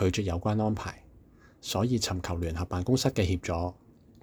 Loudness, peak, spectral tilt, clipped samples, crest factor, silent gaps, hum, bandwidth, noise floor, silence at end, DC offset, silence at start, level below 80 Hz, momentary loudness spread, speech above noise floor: -30 LUFS; -12 dBFS; -5.5 dB/octave; under 0.1%; 18 dB; none; none; over 20 kHz; -56 dBFS; 0.5 s; under 0.1%; 0 s; -46 dBFS; 10 LU; 27 dB